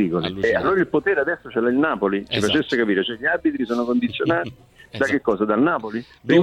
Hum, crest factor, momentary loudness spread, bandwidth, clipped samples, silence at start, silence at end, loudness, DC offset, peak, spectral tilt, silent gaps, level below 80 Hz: none; 18 dB; 5 LU; 12 kHz; under 0.1%; 0 s; 0 s; -21 LUFS; under 0.1%; -2 dBFS; -6 dB/octave; none; -52 dBFS